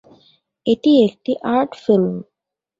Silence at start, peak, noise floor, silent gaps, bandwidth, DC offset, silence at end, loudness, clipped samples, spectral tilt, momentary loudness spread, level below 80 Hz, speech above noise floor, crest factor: 0.65 s; -4 dBFS; -57 dBFS; none; 7.6 kHz; under 0.1%; 0.55 s; -17 LUFS; under 0.1%; -8 dB/octave; 10 LU; -62 dBFS; 40 dB; 16 dB